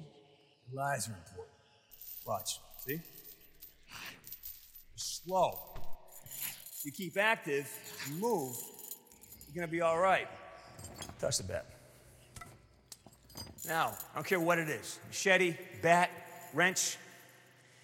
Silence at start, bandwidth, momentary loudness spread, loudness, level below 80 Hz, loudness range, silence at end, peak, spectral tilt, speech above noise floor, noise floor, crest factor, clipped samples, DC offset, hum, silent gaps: 0 s; 16.5 kHz; 24 LU; -34 LUFS; -64 dBFS; 11 LU; 0.55 s; -12 dBFS; -3 dB/octave; 30 dB; -64 dBFS; 24 dB; under 0.1%; under 0.1%; none; none